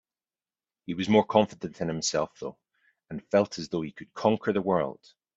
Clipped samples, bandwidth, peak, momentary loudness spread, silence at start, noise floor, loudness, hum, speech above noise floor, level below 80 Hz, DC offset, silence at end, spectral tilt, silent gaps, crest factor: under 0.1%; 8 kHz; -6 dBFS; 17 LU; 0.9 s; under -90 dBFS; -27 LUFS; none; over 63 dB; -66 dBFS; under 0.1%; 0.45 s; -5 dB/octave; none; 22 dB